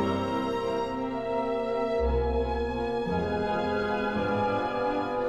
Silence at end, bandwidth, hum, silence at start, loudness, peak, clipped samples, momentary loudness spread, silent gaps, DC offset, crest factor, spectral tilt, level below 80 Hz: 0 s; 11 kHz; none; 0 s; -29 LUFS; -14 dBFS; under 0.1%; 3 LU; none; under 0.1%; 14 dB; -7 dB/octave; -40 dBFS